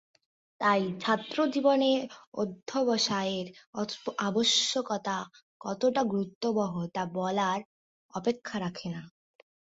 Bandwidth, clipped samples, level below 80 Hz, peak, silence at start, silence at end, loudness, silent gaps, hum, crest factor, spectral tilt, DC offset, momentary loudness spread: 8 kHz; under 0.1%; -72 dBFS; -12 dBFS; 0.6 s; 0.55 s; -29 LUFS; 2.27-2.32 s, 3.67-3.73 s, 5.42-5.60 s, 6.35-6.41 s, 7.65-8.09 s; none; 18 dB; -4 dB/octave; under 0.1%; 13 LU